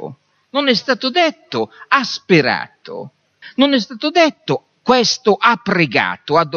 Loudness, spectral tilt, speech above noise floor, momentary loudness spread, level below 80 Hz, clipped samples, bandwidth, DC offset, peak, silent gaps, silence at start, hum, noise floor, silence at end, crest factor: -16 LUFS; -4 dB/octave; 19 dB; 11 LU; -62 dBFS; under 0.1%; 7.2 kHz; under 0.1%; 0 dBFS; none; 0 s; none; -35 dBFS; 0 s; 16 dB